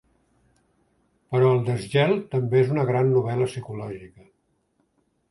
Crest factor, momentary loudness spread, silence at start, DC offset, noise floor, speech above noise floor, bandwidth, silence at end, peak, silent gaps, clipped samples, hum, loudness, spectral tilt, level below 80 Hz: 18 dB; 14 LU; 1.3 s; under 0.1%; -69 dBFS; 46 dB; 11.5 kHz; 1.25 s; -8 dBFS; none; under 0.1%; none; -23 LUFS; -7.5 dB/octave; -60 dBFS